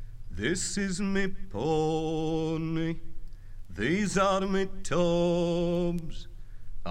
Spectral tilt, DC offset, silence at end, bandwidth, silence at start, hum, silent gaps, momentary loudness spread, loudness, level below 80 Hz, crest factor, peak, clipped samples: -5.5 dB/octave; under 0.1%; 0 s; 11.5 kHz; 0 s; none; none; 16 LU; -29 LUFS; -40 dBFS; 14 dB; -14 dBFS; under 0.1%